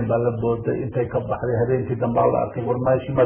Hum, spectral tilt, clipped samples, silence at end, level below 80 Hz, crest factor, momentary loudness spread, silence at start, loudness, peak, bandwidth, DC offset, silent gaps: none; -12.5 dB/octave; under 0.1%; 0 s; -44 dBFS; 14 dB; 5 LU; 0 s; -22 LUFS; -6 dBFS; 3.4 kHz; under 0.1%; none